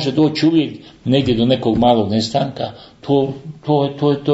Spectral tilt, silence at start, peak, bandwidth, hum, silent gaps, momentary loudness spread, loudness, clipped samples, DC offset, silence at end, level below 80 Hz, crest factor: -7 dB/octave; 0 s; 0 dBFS; 8 kHz; none; none; 13 LU; -17 LUFS; under 0.1%; under 0.1%; 0 s; -46 dBFS; 16 dB